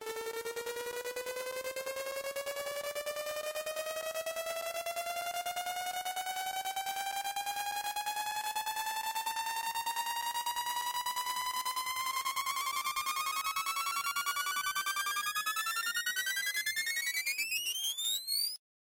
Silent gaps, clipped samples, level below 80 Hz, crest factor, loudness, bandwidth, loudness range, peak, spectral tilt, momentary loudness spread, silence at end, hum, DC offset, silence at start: none; under 0.1%; -76 dBFS; 16 dB; -35 LUFS; 17 kHz; 5 LU; -20 dBFS; 2 dB/octave; 6 LU; 0.4 s; none; under 0.1%; 0 s